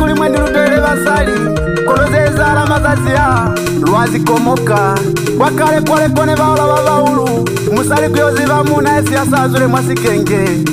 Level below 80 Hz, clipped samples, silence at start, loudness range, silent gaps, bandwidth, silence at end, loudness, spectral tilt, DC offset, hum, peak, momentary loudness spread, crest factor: -28 dBFS; under 0.1%; 0 s; 1 LU; none; 16 kHz; 0 s; -11 LUFS; -5.5 dB/octave; under 0.1%; none; 0 dBFS; 3 LU; 10 dB